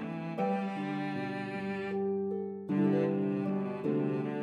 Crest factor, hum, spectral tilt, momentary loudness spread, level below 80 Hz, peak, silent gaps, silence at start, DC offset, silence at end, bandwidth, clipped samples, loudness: 14 dB; none; -9 dB/octave; 7 LU; -84 dBFS; -18 dBFS; none; 0 s; under 0.1%; 0 s; 6.6 kHz; under 0.1%; -33 LUFS